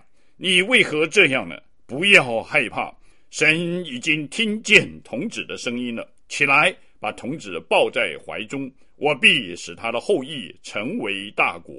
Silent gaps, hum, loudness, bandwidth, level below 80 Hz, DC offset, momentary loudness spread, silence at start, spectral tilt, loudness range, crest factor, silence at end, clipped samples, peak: none; none; -19 LUFS; 14 kHz; -60 dBFS; 0.4%; 17 LU; 0.4 s; -3 dB/octave; 4 LU; 22 dB; 0 s; under 0.1%; 0 dBFS